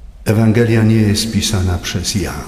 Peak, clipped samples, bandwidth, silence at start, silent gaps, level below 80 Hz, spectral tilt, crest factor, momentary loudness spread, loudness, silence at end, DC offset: 0 dBFS; under 0.1%; 15.5 kHz; 0 s; none; -32 dBFS; -5.5 dB/octave; 14 dB; 6 LU; -14 LUFS; 0 s; under 0.1%